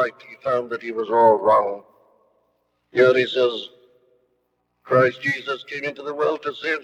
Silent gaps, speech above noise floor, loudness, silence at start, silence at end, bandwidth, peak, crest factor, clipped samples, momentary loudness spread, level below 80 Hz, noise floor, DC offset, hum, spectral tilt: none; 50 dB; -21 LUFS; 0 s; 0 s; 8.4 kHz; -4 dBFS; 18 dB; under 0.1%; 12 LU; -72 dBFS; -71 dBFS; under 0.1%; none; -6 dB/octave